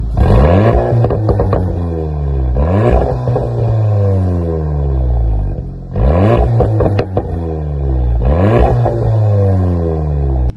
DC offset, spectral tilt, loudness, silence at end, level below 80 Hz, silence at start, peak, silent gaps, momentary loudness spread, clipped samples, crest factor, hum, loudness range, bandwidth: under 0.1%; -10 dB/octave; -13 LUFS; 0 s; -18 dBFS; 0 s; 0 dBFS; none; 8 LU; under 0.1%; 12 dB; none; 2 LU; 5.4 kHz